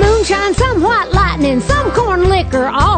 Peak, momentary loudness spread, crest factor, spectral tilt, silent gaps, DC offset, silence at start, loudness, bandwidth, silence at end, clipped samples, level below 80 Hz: 0 dBFS; 2 LU; 12 dB; -5.5 dB/octave; none; under 0.1%; 0 s; -13 LUFS; 9.2 kHz; 0 s; under 0.1%; -20 dBFS